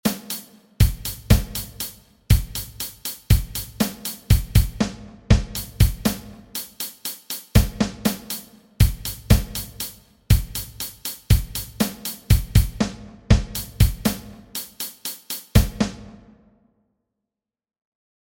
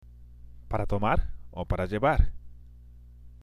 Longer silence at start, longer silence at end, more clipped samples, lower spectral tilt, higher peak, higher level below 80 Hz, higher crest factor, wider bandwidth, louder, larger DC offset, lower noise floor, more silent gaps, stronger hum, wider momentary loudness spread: second, 0.05 s vs 0.2 s; first, 2.1 s vs 0.05 s; neither; second, -5 dB/octave vs -8 dB/octave; first, 0 dBFS vs -10 dBFS; first, -26 dBFS vs -34 dBFS; about the same, 22 dB vs 20 dB; first, 17 kHz vs 11 kHz; first, -23 LUFS vs -29 LUFS; neither; first, -86 dBFS vs -49 dBFS; neither; second, none vs 60 Hz at -45 dBFS; about the same, 12 LU vs 14 LU